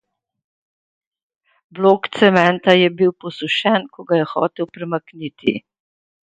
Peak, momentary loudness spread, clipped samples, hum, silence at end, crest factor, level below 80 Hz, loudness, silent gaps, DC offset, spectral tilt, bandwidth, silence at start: 0 dBFS; 12 LU; under 0.1%; none; 0.8 s; 20 dB; -64 dBFS; -17 LUFS; none; under 0.1%; -6.5 dB/octave; 9 kHz; 1.75 s